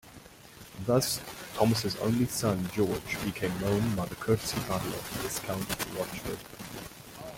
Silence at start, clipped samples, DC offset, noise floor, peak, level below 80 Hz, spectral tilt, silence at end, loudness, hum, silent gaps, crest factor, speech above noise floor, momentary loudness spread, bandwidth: 0.05 s; under 0.1%; under 0.1%; -51 dBFS; -10 dBFS; -54 dBFS; -5 dB/octave; 0 s; -31 LUFS; none; none; 22 dB; 20 dB; 16 LU; 17 kHz